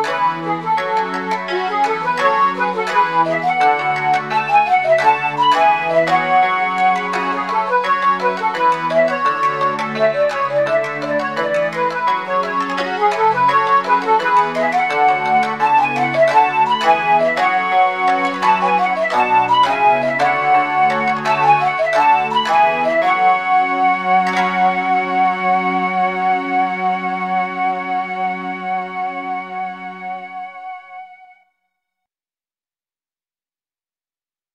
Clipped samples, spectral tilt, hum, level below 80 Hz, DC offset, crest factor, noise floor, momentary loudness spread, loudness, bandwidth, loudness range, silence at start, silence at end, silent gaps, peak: under 0.1%; -4.5 dB/octave; none; -70 dBFS; 0.2%; 14 dB; under -90 dBFS; 8 LU; -16 LUFS; 11.5 kHz; 7 LU; 0 s; 3.3 s; none; -2 dBFS